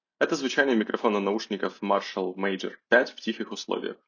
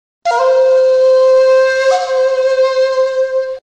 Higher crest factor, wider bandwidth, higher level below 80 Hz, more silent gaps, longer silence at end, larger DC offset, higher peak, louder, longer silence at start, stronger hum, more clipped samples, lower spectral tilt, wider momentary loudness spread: first, 22 dB vs 8 dB; second, 7.4 kHz vs 8.6 kHz; second, -78 dBFS vs -62 dBFS; neither; about the same, 0.15 s vs 0.15 s; second, under 0.1% vs 0.1%; about the same, -6 dBFS vs -4 dBFS; second, -27 LUFS vs -11 LUFS; about the same, 0.2 s vs 0.25 s; neither; neither; first, -4.5 dB/octave vs 0 dB/octave; about the same, 9 LU vs 7 LU